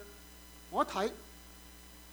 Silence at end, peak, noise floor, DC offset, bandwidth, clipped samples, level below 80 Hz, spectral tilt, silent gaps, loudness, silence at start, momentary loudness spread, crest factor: 0 s; -16 dBFS; -54 dBFS; under 0.1%; over 20 kHz; under 0.1%; -58 dBFS; -4 dB/octave; none; -35 LUFS; 0 s; 19 LU; 24 dB